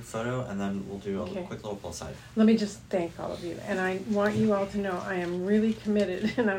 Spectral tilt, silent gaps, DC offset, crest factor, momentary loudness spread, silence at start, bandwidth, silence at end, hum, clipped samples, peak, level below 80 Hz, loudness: -6.5 dB/octave; none; under 0.1%; 16 dB; 11 LU; 0 s; 15.5 kHz; 0 s; none; under 0.1%; -12 dBFS; -56 dBFS; -29 LUFS